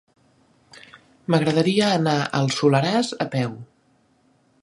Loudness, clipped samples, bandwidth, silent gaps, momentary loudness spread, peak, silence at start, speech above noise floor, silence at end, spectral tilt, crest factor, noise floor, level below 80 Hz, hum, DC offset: -21 LUFS; under 0.1%; 11.5 kHz; none; 9 LU; -4 dBFS; 0.75 s; 41 dB; 1 s; -5.5 dB/octave; 20 dB; -62 dBFS; -64 dBFS; none; under 0.1%